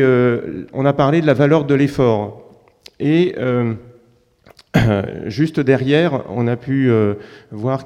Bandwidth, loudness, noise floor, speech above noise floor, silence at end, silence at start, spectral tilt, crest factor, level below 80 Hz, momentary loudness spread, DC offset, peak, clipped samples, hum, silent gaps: 13 kHz; -17 LUFS; -54 dBFS; 38 dB; 0 s; 0 s; -8 dB/octave; 16 dB; -44 dBFS; 10 LU; under 0.1%; 0 dBFS; under 0.1%; none; none